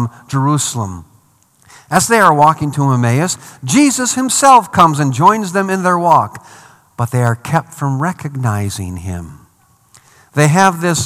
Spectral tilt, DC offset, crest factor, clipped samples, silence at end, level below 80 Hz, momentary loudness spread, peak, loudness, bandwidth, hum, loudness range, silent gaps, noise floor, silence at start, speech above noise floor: -5 dB/octave; under 0.1%; 14 dB; 0.5%; 0 s; -52 dBFS; 14 LU; 0 dBFS; -13 LUFS; 15 kHz; none; 8 LU; none; -52 dBFS; 0 s; 39 dB